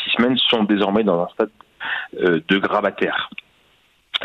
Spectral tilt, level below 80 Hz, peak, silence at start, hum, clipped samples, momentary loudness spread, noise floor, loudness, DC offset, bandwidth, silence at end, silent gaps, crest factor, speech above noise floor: -6.5 dB/octave; -58 dBFS; -4 dBFS; 0 s; none; under 0.1%; 10 LU; -59 dBFS; -19 LUFS; under 0.1%; 7.6 kHz; 0 s; none; 16 dB; 40 dB